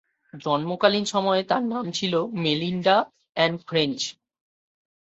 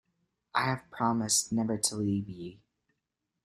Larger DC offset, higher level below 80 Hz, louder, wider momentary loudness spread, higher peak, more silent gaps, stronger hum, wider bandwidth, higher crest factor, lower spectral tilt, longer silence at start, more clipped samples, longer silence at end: neither; about the same, -66 dBFS vs -66 dBFS; first, -24 LUFS vs -30 LUFS; second, 6 LU vs 14 LU; first, -2 dBFS vs -10 dBFS; neither; neither; second, 8.2 kHz vs 15.5 kHz; about the same, 22 dB vs 22 dB; about the same, -4.5 dB/octave vs -3.5 dB/octave; second, 0.35 s vs 0.55 s; neither; about the same, 0.95 s vs 0.9 s